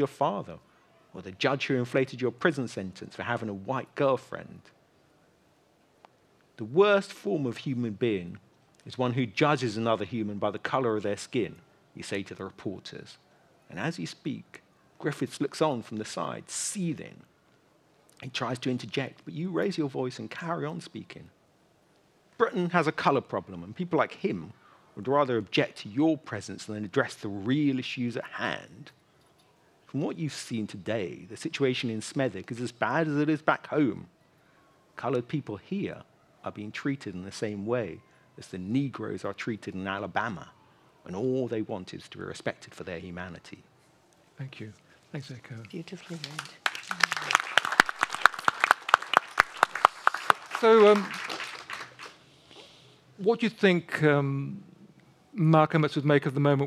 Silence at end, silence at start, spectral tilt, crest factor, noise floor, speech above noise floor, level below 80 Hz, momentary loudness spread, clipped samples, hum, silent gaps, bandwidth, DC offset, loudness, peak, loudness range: 0 s; 0 s; -5 dB/octave; 30 dB; -64 dBFS; 35 dB; -72 dBFS; 19 LU; under 0.1%; none; none; 15.5 kHz; under 0.1%; -29 LUFS; 0 dBFS; 11 LU